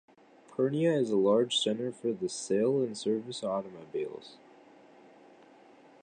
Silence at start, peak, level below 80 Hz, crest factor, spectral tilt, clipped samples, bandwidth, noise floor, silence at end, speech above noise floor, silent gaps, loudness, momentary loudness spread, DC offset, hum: 0.6 s; -14 dBFS; -78 dBFS; 18 dB; -5 dB/octave; under 0.1%; 9.8 kHz; -57 dBFS; 1.7 s; 27 dB; none; -30 LUFS; 14 LU; under 0.1%; none